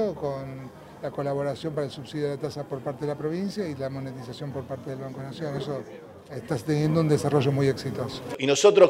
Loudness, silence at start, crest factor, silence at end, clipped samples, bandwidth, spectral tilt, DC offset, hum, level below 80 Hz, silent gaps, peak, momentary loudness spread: -28 LUFS; 0 s; 22 dB; 0 s; under 0.1%; 15.5 kHz; -6 dB/octave; under 0.1%; none; -62 dBFS; none; -6 dBFS; 14 LU